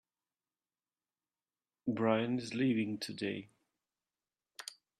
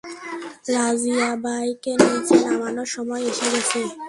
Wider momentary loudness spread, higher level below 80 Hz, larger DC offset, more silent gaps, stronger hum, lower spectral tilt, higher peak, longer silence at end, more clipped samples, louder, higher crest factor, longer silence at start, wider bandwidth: first, 16 LU vs 11 LU; second, -78 dBFS vs -64 dBFS; neither; neither; neither; first, -6 dB/octave vs -3 dB/octave; second, -18 dBFS vs 0 dBFS; first, 0.25 s vs 0 s; neither; second, -35 LUFS vs -21 LUFS; about the same, 20 dB vs 22 dB; first, 1.85 s vs 0.05 s; first, 13 kHz vs 11.5 kHz